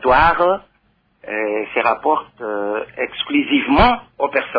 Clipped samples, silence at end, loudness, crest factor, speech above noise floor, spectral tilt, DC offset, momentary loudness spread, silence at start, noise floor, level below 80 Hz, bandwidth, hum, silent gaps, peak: under 0.1%; 0 s; -18 LUFS; 16 dB; 44 dB; -7.5 dB/octave; under 0.1%; 11 LU; 0 s; -61 dBFS; -36 dBFS; 5.2 kHz; none; none; -2 dBFS